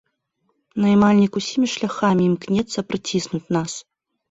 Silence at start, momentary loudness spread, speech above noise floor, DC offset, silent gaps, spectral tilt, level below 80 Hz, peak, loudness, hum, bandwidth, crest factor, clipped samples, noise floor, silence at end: 0.75 s; 10 LU; 51 dB; under 0.1%; none; -5.5 dB/octave; -56 dBFS; -4 dBFS; -20 LUFS; none; 8 kHz; 16 dB; under 0.1%; -70 dBFS; 0.5 s